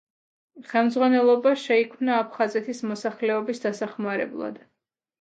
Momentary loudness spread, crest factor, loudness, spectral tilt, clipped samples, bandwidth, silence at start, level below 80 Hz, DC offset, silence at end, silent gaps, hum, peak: 11 LU; 18 dB; -24 LUFS; -5 dB/octave; under 0.1%; 9 kHz; 0.55 s; -78 dBFS; under 0.1%; 0.65 s; none; none; -8 dBFS